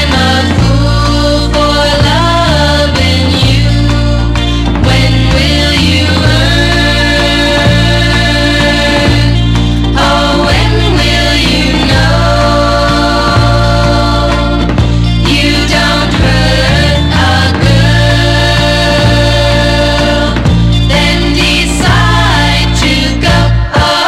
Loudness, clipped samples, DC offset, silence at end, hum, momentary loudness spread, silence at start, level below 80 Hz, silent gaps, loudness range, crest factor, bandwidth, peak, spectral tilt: -8 LUFS; under 0.1%; under 0.1%; 0 s; none; 2 LU; 0 s; -14 dBFS; none; 1 LU; 8 dB; 14 kHz; 0 dBFS; -5 dB/octave